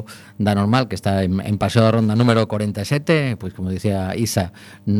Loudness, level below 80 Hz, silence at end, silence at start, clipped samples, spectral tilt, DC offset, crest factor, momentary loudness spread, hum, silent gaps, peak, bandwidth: -19 LUFS; -50 dBFS; 0 s; 0 s; under 0.1%; -6.5 dB/octave; under 0.1%; 18 dB; 9 LU; none; none; 0 dBFS; 19 kHz